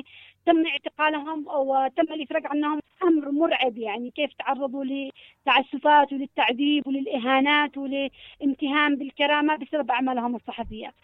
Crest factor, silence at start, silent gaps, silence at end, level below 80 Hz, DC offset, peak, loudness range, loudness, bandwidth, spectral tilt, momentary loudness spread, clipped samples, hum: 18 dB; 0.15 s; none; 0.15 s; -60 dBFS; under 0.1%; -6 dBFS; 3 LU; -24 LUFS; 4.1 kHz; -6.5 dB/octave; 11 LU; under 0.1%; none